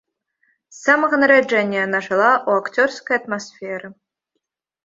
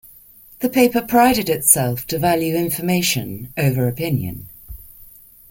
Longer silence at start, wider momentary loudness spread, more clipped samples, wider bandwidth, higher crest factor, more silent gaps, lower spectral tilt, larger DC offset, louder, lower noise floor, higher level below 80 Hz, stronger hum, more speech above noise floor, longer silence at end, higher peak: first, 0.75 s vs 0.6 s; second, 15 LU vs 19 LU; neither; second, 7.8 kHz vs 17 kHz; about the same, 18 dB vs 20 dB; neither; about the same, -4.5 dB/octave vs -4.5 dB/octave; neither; about the same, -17 LUFS vs -18 LUFS; first, -77 dBFS vs -46 dBFS; second, -68 dBFS vs -46 dBFS; neither; first, 59 dB vs 28 dB; first, 0.95 s vs 0.45 s; about the same, -2 dBFS vs 0 dBFS